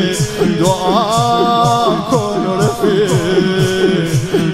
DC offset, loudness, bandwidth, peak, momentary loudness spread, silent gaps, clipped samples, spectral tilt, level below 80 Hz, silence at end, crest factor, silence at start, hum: under 0.1%; -13 LUFS; 16 kHz; 0 dBFS; 3 LU; none; under 0.1%; -5.5 dB/octave; -40 dBFS; 0 s; 12 dB; 0 s; none